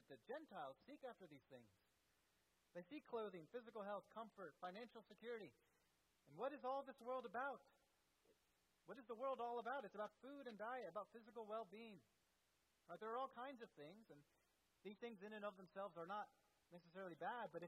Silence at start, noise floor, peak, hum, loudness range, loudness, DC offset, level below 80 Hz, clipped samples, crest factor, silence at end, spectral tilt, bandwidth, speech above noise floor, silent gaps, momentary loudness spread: 0.1 s; -85 dBFS; -38 dBFS; none; 5 LU; -54 LUFS; under 0.1%; under -90 dBFS; under 0.1%; 18 dB; 0 s; -6 dB/octave; 12 kHz; 31 dB; none; 13 LU